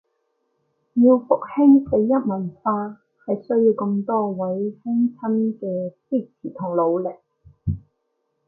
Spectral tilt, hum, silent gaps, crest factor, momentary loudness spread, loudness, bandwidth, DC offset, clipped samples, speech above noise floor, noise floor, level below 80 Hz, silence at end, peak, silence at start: -14 dB/octave; none; none; 18 dB; 13 LU; -21 LUFS; 2.9 kHz; under 0.1%; under 0.1%; 53 dB; -73 dBFS; -48 dBFS; 0.7 s; -4 dBFS; 0.95 s